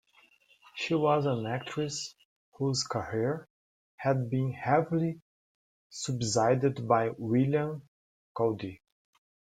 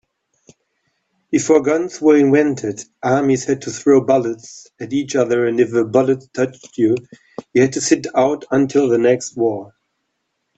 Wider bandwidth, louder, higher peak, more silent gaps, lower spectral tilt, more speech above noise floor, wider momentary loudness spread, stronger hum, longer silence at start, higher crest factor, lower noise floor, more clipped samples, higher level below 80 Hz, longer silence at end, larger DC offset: first, 9.6 kHz vs 8.2 kHz; second, -30 LUFS vs -17 LUFS; second, -10 dBFS vs 0 dBFS; first, 2.25-2.52 s, 3.50-3.98 s, 5.22-5.90 s, 7.88-8.35 s vs none; about the same, -5.5 dB/octave vs -5.5 dB/octave; second, 35 dB vs 56 dB; about the same, 13 LU vs 11 LU; neither; second, 0.75 s vs 1.3 s; about the same, 20 dB vs 16 dB; second, -64 dBFS vs -72 dBFS; neither; second, -68 dBFS vs -60 dBFS; about the same, 0.8 s vs 0.9 s; neither